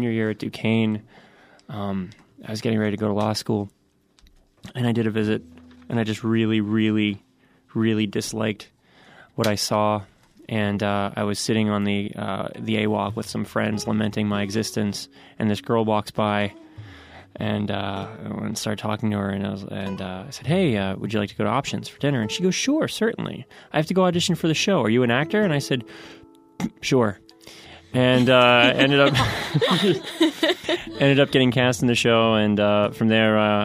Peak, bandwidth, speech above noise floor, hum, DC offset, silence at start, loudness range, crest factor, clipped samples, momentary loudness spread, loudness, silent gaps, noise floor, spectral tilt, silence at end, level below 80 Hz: -2 dBFS; 15.5 kHz; 35 dB; none; under 0.1%; 0 s; 8 LU; 20 dB; under 0.1%; 13 LU; -22 LUFS; none; -57 dBFS; -5.5 dB/octave; 0 s; -54 dBFS